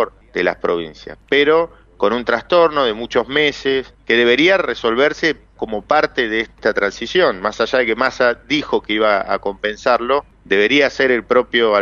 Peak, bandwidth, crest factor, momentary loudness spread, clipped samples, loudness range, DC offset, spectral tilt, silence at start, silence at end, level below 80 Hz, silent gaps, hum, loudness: -2 dBFS; 7.2 kHz; 14 dB; 8 LU; under 0.1%; 2 LU; under 0.1%; -4 dB/octave; 0 s; 0 s; -48 dBFS; none; none; -16 LUFS